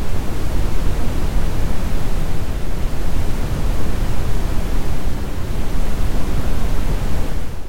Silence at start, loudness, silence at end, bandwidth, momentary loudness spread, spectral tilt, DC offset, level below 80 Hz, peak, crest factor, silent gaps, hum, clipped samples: 0 s; -24 LUFS; 0 s; 16 kHz; 3 LU; -6 dB/octave; under 0.1%; -20 dBFS; -4 dBFS; 8 dB; none; none; under 0.1%